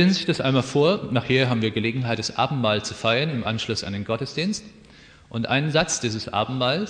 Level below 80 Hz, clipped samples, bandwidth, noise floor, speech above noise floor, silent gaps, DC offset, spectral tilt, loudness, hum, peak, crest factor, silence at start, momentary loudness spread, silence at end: -54 dBFS; under 0.1%; 10 kHz; -49 dBFS; 26 dB; none; under 0.1%; -5 dB/octave; -23 LUFS; none; -6 dBFS; 18 dB; 0 s; 7 LU; 0 s